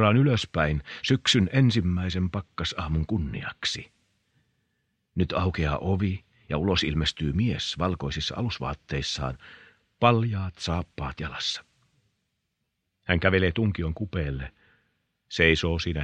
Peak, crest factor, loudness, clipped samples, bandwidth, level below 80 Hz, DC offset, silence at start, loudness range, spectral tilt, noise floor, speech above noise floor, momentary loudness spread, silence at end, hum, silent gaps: -4 dBFS; 24 dB; -26 LUFS; under 0.1%; 9.8 kHz; -42 dBFS; under 0.1%; 0 s; 5 LU; -5.5 dB/octave; -79 dBFS; 53 dB; 12 LU; 0 s; none; none